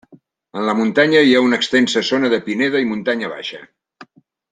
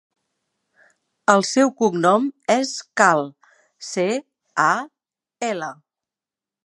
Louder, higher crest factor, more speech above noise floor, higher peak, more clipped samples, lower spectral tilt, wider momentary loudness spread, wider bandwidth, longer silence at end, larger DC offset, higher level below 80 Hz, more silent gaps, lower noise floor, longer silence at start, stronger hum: first, -16 LUFS vs -20 LUFS; second, 16 dB vs 22 dB; second, 34 dB vs 70 dB; about the same, -2 dBFS vs 0 dBFS; neither; about the same, -4.5 dB/octave vs -4 dB/octave; first, 15 LU vs 12 LU; second, 9.4 kHz vs 11.5 kHz; second, 0.5 s vs 0.95 s; neither; first, -62 dBFS vs -74 dBFS; neither; second, -50 dBFS vs -89 dBFS; second, 0.55 s vs 1.3 s; neither